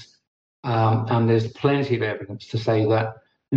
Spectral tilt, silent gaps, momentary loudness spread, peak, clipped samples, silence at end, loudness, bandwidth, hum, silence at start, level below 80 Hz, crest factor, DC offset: -8.5 dB/octave; 0.27-0.63 s; 11 LU; -8 dBFS; under 0.1%; 0 s; -22 LUFS; 7.2 kHz; none; 0 s; -60 dBFS; 14 dB; under 0.1%